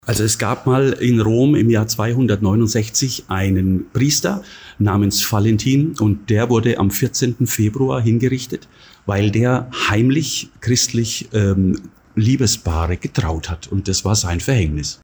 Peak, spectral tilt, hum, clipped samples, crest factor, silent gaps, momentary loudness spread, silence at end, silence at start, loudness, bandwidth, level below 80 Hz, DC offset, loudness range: -6 dBFS; -5 dB/octave; none; under 0.1%; 12 dB; none; 7 LU; 0.1 s; 0.05 s; -17 LUFS; over 20 kHz; -36 dBFS; under 0.1%; 2 LU